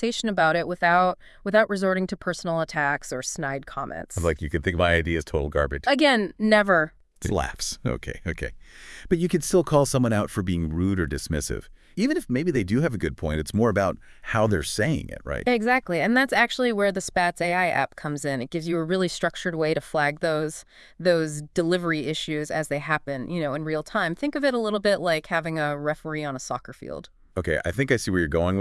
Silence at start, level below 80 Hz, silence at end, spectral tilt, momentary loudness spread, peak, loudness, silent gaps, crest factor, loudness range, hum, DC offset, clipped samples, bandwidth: 0 s; -44 dBFS; 0 s; -5 dB/octave; 11 LU; -6 dBFS; -24 LUFS; none; 20 dB; 4 LU; none; under 0.1%; under 0.1%; 12 kHz